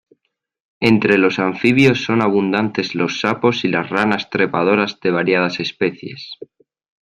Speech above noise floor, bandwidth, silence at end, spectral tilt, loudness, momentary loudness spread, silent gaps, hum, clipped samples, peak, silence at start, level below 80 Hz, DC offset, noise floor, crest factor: 52 dB; 10.5 kHz; 0.6 s; -6 dB/octave; -17 LUFS; 9 LU; none; none; under 0.1%; -2 dBFS; 0.8 s; -56 dBFS; under 0.1%; -69 dBFS; 16 dB